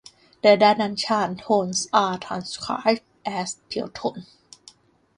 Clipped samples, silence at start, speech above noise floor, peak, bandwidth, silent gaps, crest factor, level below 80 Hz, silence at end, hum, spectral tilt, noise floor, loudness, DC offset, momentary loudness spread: under 0.1%; 0.45 s; 31 dB; -4 dBFS; 11 kHz; none; 20 dB; -64 dBFS; 0.95 s; none; -3.5 dB/octave; -53 dBFS; -23 LUFS; under 0.1%; 14 LU